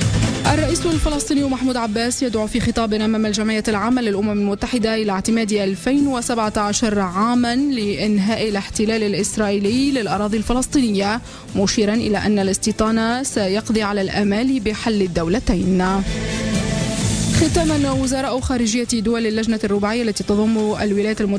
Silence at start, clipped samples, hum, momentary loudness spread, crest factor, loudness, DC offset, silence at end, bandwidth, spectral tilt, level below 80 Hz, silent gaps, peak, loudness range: 0 s; under 0.1%; none; 3 LU; 12 dB; -19 LUFS; under 0.1%; 0 s; 11 kHz; -5 dB/octave; -34 dBFS; none; -6 dBFS; 1 LU